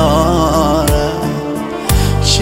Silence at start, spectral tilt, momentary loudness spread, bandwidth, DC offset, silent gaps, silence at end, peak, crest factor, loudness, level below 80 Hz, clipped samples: 0 s; -5 dB/octave; 7 LU; 16.5 kHz; under 0.1%; none; 0 s; 0 dBFS; 12 dB; -14 LUFS; -20 dBFS; under 0.1%